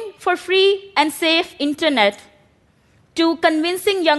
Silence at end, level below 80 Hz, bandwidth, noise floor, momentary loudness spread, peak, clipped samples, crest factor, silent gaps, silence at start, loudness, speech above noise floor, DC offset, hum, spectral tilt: 0 s; -62 dBFS; 12.5 kHz; -57 dBFS; 7 LU; 0 dBFS; under 0.1%; 18 dB; none; 0 s; -17 LUFS; 39 dB; under 0.1%; none; -2.5 dB/octave